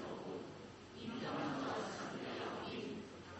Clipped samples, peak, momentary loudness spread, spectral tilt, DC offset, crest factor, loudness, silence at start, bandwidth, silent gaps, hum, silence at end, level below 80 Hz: under 0.1%; -30 dBFS; 9 LU; -5 dB/octave; under 0.1%; 16 dB; -45 LUFS; 0 s; 8.2 kHz; none; none; 0 s; -70 dBFS